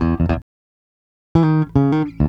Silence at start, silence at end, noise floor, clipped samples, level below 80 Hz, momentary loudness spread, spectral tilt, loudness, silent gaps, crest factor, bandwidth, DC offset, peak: 0 s; 0 s; under -90 dBFS; under 0.1%; -30 dBFS; 5 LU; -10 dB/octave; -18 LUFS; 0.42-1.35 s; 18 dB; 5.8 kHz; under 0.1%; 0 dBFS